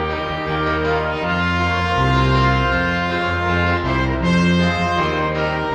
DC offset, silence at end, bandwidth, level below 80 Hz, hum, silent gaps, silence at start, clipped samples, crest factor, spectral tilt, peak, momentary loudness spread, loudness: under 0.1%; 0 s; 9 kHz; -30 dBFS; none; none; 0 s; under 0.1%; 14 dB; -6.5 dB/octave; -4 dBFS; 4 LU; -18 LUFS